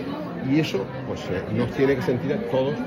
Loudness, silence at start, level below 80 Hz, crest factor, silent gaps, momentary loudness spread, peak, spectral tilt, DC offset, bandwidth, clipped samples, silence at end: -25 LUFS; 0 s; -50 dBFS; 14 dB; none; 8 LU; -10 dBFS; -7 dB/octave; under 0.1%; 16 kHz; under 0.1%; 0 s